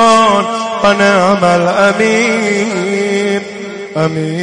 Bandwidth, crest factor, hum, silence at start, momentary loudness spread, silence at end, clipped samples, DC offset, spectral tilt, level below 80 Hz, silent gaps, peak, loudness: 10.5 kHz; 12 dB; none; 0 s; 8 LU; 0 s; under 0.1%; under 0.1%; -4.5 dB/octave; -48 dBFS; none; 0 dBFS; -11 LUFS